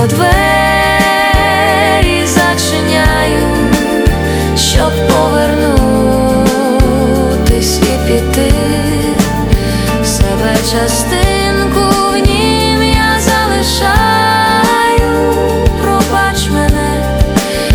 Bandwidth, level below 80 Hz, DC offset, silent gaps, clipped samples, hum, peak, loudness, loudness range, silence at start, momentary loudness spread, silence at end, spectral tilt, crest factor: over 20 kHz; -18 dBFS; under 0.1%; none; under 0.1%; none; 0 dBFS; -10 LUFS; 2 LU; 0 s; 3 LU; 0 s; -4.5 dB/octave; 10 dB